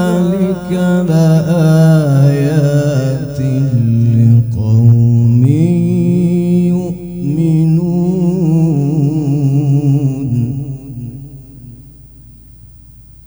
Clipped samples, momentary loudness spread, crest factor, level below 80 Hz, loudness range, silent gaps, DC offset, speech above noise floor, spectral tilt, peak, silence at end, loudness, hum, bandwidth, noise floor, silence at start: under 0.1%; 9 LU; 12 dB; -40 dBFS; 6 LU; none; under 0.1%; 27 dB; -9 dB/octave; 0 dBFS; 0.6 s; -12 LUFS; none; over 20 kHz; -37 dBFS; 0 s